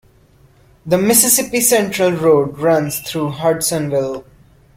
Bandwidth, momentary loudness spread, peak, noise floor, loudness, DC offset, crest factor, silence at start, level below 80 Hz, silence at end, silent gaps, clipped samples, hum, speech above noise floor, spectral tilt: 16.5 kHz; 10 LU; 0 dBFS; -50 dBFS; -15 LUFS; under 0.1%; 16 dB; 0.85 s; -52 dBFS; 0.55 s; none; under 0.1%; none; 35 dB; -3.5 dB/octave